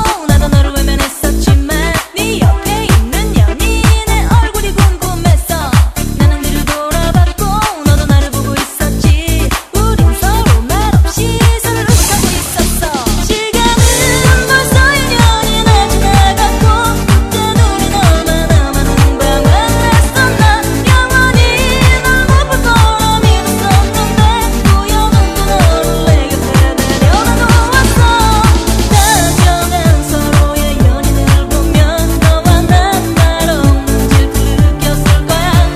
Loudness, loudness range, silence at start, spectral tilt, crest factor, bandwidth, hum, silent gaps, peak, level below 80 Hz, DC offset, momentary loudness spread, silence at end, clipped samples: -10 LUFS; 3 LU; 0 s; -4.5 dB/octave; 8 dB; 16 kHz; none; none; 0 dBFS; -14 dBFS; under 0.1%; 5 LU; 0 s; 0.2%